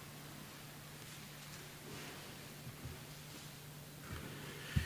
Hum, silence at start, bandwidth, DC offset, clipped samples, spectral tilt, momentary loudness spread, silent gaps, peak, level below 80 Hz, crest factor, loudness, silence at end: none; 0 s; 16 kHz; under 0.1%; under 0.1%; -4 dB/octave; 4 LU; none; -20 dBFS; -56 dBFS; 28 dB; -50 LUFS; 0 s